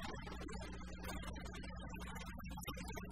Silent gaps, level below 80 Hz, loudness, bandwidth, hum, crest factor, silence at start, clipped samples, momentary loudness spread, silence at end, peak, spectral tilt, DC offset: none; -52 dBFS; -49 LUFS; 16 kHz; none; 16 dB; 0 s; under 0.1%; 2 LU; 0 s; -32 dBFS; -4.5 dB/octave; 0.1%